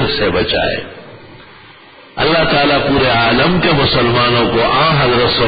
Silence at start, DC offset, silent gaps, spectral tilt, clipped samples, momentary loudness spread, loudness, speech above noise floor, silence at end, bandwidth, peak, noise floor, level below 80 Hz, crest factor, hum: 0 s; under 0.1%; none; -11 dB/octave; under 0.1%; 6 LU; -12 LUFS; 27 dB; 0 s; 5 kHz; -2 dBFS; -40 dBFS; -34 dBFS; 12 dB; none